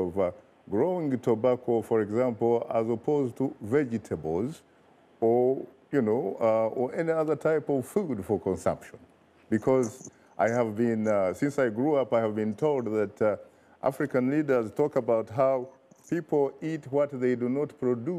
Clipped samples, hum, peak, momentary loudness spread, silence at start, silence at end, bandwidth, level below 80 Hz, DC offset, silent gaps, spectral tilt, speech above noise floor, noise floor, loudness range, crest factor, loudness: under 0.1%; none; -14 dBFS; 7 LU; 0 s; 0 s; 14.5 kHz; -66 dBFS; under 0.1%; none; -7.5 dB/octave; 32 dB; -59 dBFS; 2 LU; 14 dB; -28 LUFS